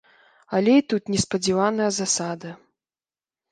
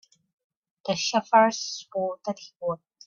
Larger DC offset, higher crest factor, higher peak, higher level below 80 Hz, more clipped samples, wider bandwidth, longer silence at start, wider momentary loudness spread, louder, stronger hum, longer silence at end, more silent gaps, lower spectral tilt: neither; about the same, 18 dB vs 20 dB; about the same, -6 dBFS vs -8 dBFS; first, -58 dBFS vs -74 dBFS; neither; first, 10 kHz vs 7.4 kHz; second, 0.5 s vs 0.85 s; about the same, 12 LU vs 14 LU; first, -22 LUFS vs -26 LUFS; neither; first, 0.95 s vs 0.3 s; neither; about the same, -4 dB/octave vs -3 dB/octave